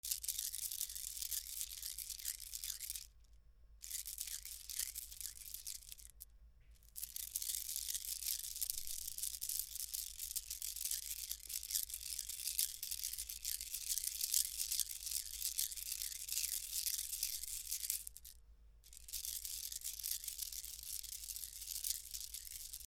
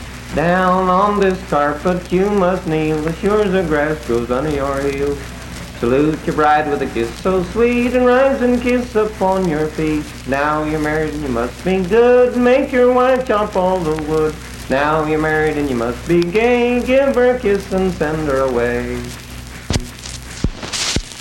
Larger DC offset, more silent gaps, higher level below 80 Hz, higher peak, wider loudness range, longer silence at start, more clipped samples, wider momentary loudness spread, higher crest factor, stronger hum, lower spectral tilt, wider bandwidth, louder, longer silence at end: neither; neither; second, -64 dBFS vs -34 dBFS; second, -12 dBFS vs -2 dBFS; first, 7 LU vs 4 LU; about the same, 0.05 s vs 0 s; neither; about the same, 9 LU vs 10 LU; first, 32 dB vs 14 dB; neither; second, 3 dB/octave vs -5.5 dB/octave; first, over 20 kHz vs 17 kHz; second, -41 LUFS vs -16 LUFS; about the same, 0 s vs 0 s